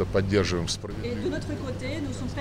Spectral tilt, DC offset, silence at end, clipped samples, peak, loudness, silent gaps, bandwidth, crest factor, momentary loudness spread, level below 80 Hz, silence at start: -5.5 dB/octave; under 0.1%; 0 s; under 0.1%; -12 dBFS; -29 LUFS; none; 14 kHz; 16 dB; 8 LU; -42 dBFS; 0 s